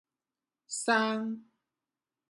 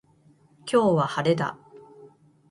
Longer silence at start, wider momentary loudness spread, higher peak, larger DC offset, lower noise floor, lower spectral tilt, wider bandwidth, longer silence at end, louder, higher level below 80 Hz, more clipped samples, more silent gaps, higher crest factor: about the same, 0.7 s vs 0.65 s; about the same, 12 LU vs 10 LU; second, -12 dBFS vs -8 dBFS; neither; first, under -90 dBFS vs -59 dBFS; second, -3 dB/octave vs -6.5 dB/octave; about the same, 11.5 kHz vs 11.5 kHz; first, 0.9 s vs 0.45 s; second, -31 LUFS vs -24 LUFS; second, -86 dBFS vs -66 dBFS; neither; neither; about the same, 22 dB vs 18 dB